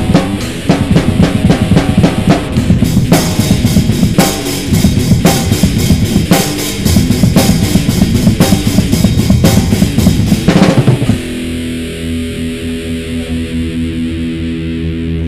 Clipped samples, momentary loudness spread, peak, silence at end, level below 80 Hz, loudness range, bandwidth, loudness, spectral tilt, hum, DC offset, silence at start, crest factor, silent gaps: 0.6%; 9 LU; 0 dBFS; 0 s; -22 dBFS; 7 LU; 16.5 kHz; -11 LUFS; -5.5 dB/octave; none; under 0.1%; 0 s; 10 dB; none